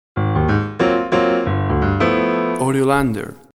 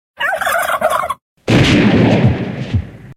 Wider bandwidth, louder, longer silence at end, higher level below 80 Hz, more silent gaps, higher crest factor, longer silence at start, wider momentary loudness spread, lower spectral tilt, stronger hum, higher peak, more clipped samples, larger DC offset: second, 13.5 kHz vs 16 kHz; second, -18 LUFS vs -14 LUFS; first, 0.25 s vs 0.05 s; about the same, -34 dBFS vs -34 dBFS; second, none vs 1.22-1.37 s; about the same, 14 dB vs 14 dB; about the same, 0.15 s vs 0.2 s; second, 3 LU vs 11 LU; about the same, -7 dB/octave vs -6 dB/octave; neither; about the same, -2 dBFS vs 0 dBFS; neither; neither